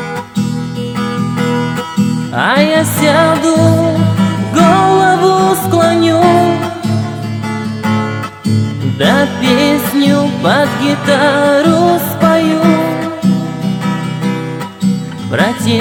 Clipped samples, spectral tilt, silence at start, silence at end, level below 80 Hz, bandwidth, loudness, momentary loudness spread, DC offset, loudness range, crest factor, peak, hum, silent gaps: under 0.1%; -5.5 dB/octave; 0 s; 0 s; -48 dBFS; 19.5 kHz; -12 LUFS; 9 LU; under 0.1%; 4 LU; 12 dB; 0 dBFS; none; none